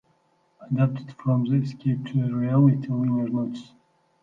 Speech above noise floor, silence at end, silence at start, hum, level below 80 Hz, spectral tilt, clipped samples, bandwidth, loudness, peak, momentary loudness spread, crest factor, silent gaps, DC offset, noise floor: 42 dB; 0.6 s; 0.6 s; none; -68 dBFS; -10 dB/octave; under 0.1%; 5.8 kHz; -24 LUFS; -8 dBFS; 10 LU; 16 dB; none; under 0.1%; -66 dBFS